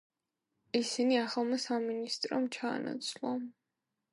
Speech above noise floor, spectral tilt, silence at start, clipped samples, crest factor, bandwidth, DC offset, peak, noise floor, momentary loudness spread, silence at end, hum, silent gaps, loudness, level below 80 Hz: 53 dB; -3 dB/octave; 0.75 s; under 0.1%; 18 dB; 11.5 kHz; under 0.1%; -18 dBFS; -87 dBFS; 8 LU; 0.6 s; none; none; -34 LUFS; -86 dBFS